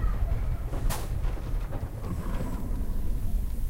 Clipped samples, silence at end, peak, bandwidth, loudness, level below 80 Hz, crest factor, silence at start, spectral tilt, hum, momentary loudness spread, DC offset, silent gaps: under 0.1%; 0 s; -16 dBFS; 16 kHz; -34 LUFS; -30 dBFS; 12 dB; 0 s; -6.5 dB/octave; none; 4 LU; under 0.1%; none